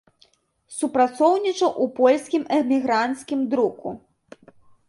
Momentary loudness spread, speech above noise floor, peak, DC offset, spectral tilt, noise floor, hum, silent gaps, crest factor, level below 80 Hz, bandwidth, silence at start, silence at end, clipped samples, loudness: 13 LU; 40 dB; -4 dBFS; under 0.1%; -4 dB/octave; -61 dBFS; none; none; 18 dB; -68 dBFS; 11.5 kHz; 0.7 s; 0.9 s; under 0.1%; -21 LUFS